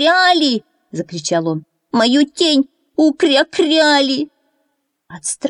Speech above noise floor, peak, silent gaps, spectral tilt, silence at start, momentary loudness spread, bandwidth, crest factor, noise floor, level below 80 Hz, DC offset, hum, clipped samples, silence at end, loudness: 54 dB; -2 dBFS; none; -3 dB/octave; 0 s; 14 LU; 11 kHz; 14 dB; -68 dBFS; -66 dBFS; under 0.1%; none; under 0.1%; 0 s; -15 LUFS